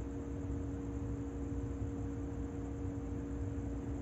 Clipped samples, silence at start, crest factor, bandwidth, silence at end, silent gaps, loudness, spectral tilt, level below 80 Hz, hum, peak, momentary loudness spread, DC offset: under 0.1%; 0 s; 12 dB; 8.2 kHz; 0 s; none; -42 LUFS; -8.5 dB/octave; -46 dBFS; none; -28 dBFS; 1 LU; under 0.1%